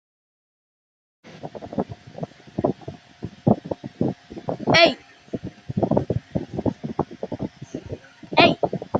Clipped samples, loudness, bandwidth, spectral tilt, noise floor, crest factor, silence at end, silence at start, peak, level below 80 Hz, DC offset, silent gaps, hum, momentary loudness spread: under 0.1%; -23 LUFS; 7.8 kHz; -6 dB/octave; -41 dBFS; 24 dB; 0 s; 1.25 s; -2 dBFS; -52 dBFS; under 0.1%; none; none; 21 LU